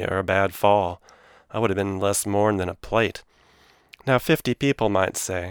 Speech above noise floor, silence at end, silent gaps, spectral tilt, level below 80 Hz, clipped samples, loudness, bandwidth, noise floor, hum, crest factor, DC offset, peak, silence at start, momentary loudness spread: 34 dB; 0 s; none; -4.5 dB/octave; -52 dBFS; under 0.1%; -23 LUFS; over 20 kHz; -57 dBFS; none; 20 dB; under 0.1%; -4 dBFS; 0 s; 9 LU